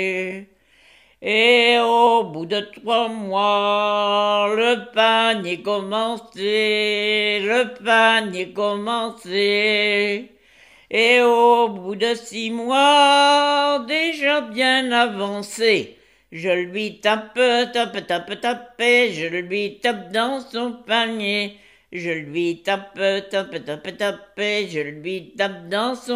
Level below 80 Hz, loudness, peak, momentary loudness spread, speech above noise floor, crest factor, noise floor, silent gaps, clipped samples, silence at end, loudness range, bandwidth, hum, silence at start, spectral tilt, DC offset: -68 dBFS; -19 LUFS; -2 dBFS; 12 LU; 34 dB; 18 dB; -53 dBFS; none; under 0.1%; 0 s; 7 LU; 15 kHz; none; 0 s; -3.5 dB/octave; under 0.1%